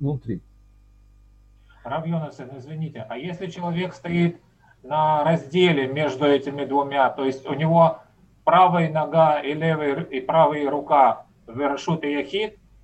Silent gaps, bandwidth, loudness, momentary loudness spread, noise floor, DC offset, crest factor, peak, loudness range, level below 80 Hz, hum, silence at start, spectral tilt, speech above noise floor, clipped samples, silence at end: none; 8.2 kHz; -22 LUFS; 15 LU; -52 dBFS; under 0.1%; 18 dB; -4 dBFS; 11 LU; -58 dBFS; none; 0 s; -7.5 dB/octave; 31 dB; under 0.1%; 0.35 s